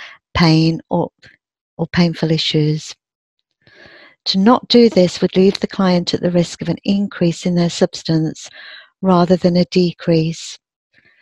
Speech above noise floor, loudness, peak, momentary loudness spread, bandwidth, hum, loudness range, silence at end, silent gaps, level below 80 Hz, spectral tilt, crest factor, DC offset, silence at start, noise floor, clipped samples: 32 dB; -16 LUFS; 0 dBFS; 12 LU; 9 kHz; none; 5 LU; 0.65 s; 1.61-1.77 s, 3.15-3.37 s; -46 dBFS; -6.5 dB/octave; 16 dB; under 0.1%; 0 s; -47 dBFS; under 0.1%